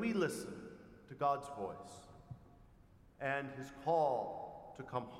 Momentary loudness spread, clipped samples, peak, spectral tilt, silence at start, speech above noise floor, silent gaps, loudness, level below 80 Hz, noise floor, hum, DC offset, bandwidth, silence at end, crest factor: 22 LU; under 0.1%; -22 dBFS; -5.5 dB/octave; 0 s; 24 dB; none; -39 LUFS; -68 dBFS; -63 dBFS; none; under 0.1%; 16 kHz; 0 s; 18 dB